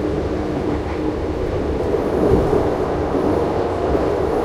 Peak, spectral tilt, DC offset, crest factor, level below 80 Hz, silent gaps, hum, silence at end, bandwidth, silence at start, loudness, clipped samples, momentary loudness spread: -2 dBFS; -8 dB/octave; under 0.1%; 16 dB; -30 dBFS; none; none; 0 s; 14.5 kHz; 0 s; -20 LUFS; under 0.1%; 6 LU